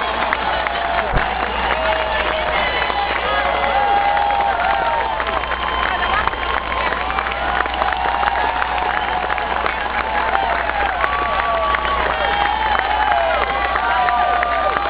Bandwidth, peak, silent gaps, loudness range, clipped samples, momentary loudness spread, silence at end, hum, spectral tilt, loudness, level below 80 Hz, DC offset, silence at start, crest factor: 4 kHz; 0 dBFS; none; 2 LU; under 0.1%; 3 LU; 0 s; none; -7.5 dB/octave; -18 LUFS; -34 dBFS; under 0.1%; 0 s; 18 dB